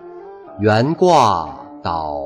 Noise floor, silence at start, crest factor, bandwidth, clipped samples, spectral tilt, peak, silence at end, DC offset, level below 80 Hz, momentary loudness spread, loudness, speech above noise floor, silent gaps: -36 dBFS; 0 s; 14 dB; 12.5 kHz; under 0.1%; -6 dB/octave; -2 dBFS; 0 s; under 0.1%; -46 dBFS; 24 LU; -16 LUFS; 21 dB; none